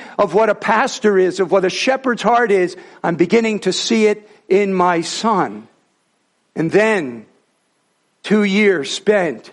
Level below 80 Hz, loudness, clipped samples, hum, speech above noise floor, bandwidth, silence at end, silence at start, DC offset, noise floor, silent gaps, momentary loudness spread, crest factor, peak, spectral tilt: -62 dBFS; -16 LUFS; under 0.1%; none; 48 dB; 11.5 kHz; 0.05 s; 0 s; under 0.1%; -64 dBFS; none; 9 LU; 16 dB; -2 dBFS; -4.5 dB/octave